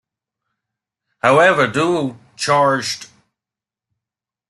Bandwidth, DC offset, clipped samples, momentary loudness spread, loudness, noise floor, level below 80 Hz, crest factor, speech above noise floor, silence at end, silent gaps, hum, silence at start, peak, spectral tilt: 12.5 kHz; under 0.1%; under 0.1%; 13 LU; -16 LUFS; -88 dBFS; -62 dBFS; 18 dB; 73 dB; 1.45 s; none; none; 1.25 s; 0 dBFS; -4.5 dB/octave